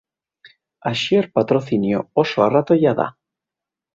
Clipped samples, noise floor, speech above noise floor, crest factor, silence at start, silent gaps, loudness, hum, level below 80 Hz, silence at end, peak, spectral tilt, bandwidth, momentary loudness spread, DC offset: under 0.1%; -87 dBFS; 69 dB; 18 dB; 0.45 s; none; -19 LUFS; none; -60 dBFS; 0.85 s; -2 dBFS; -6.5 dB/octave; 7.8 kHz; 8 LU; under 0.1%